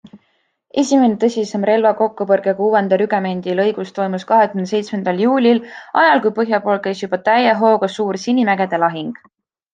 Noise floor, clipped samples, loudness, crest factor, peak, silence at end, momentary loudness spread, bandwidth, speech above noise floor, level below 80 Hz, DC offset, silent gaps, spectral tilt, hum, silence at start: -64 dBFS; under 0.1%; -16 LUFS; 14 dB; -2 dBFS; 0.6 s; 8 LU; 9.2 kHz; 48 dB; -68 dBFS; under 0.1%; none; -5.5 dB/octave; none; 0.15 s